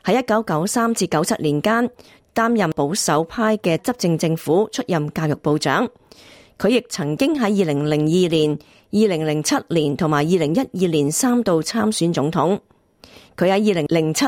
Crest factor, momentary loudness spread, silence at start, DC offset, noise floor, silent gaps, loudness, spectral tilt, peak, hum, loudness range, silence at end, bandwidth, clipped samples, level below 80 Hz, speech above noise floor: 14 dB; 4 LU; 0.05 s; under 0.1%; -48 dBFS; none; -19 LUFS; -5 dB/octave; -4 dBFS; none; 2 LU; 0 s; 16.5 kHz; under 0.1%; -56 dBFS; 29 dB